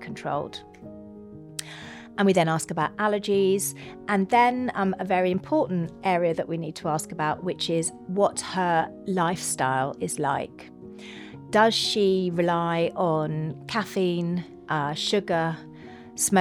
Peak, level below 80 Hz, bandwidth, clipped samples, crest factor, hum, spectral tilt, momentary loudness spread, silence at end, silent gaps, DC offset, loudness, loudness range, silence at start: -6 dBFS; -64 dBFS; 19 kHz; under 0.1%; 20 dB; none; -4.5 dB/octave; 19 LU; 0 s; none; under 0.1%; -25 LUFS; 3 LU; 0 s